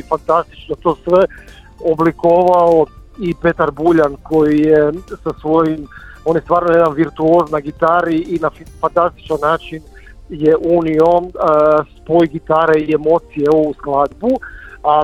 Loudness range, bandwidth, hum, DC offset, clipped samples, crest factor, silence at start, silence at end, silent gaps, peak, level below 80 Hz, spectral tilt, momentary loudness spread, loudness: 3 LU; 9.8 kHz; none; under 0.1%; under 0.1%; 14 dB; 0.1 s; 0 s; none; 0 dBFS; -40 dBFS; -8 dB/octave; 10 LU; -14 LUFS